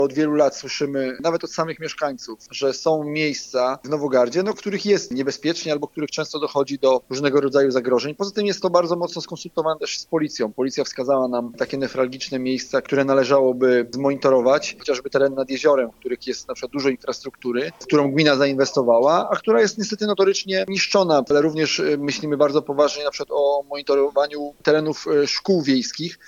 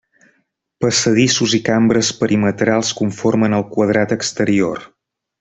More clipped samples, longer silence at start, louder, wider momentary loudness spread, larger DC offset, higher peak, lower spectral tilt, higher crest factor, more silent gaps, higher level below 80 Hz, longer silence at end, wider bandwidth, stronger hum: neither; second, 0 s vs 0.8 s; second, -21 LUFS vs -16 LUFS; first, 9 LU vs 5 LU; neither; about the same, -2 dBFS vs 0 dBFS; about the same, -4.5 dB/octave vs -4.5 dB/octave; about the same, 20 dB vs 16 dB; neither; second, -62 dBFS vs -52 dBFS; second, 0.15 s vs 0.55 s; about the same, 8.2 kHz vs 8.4 kHz; neither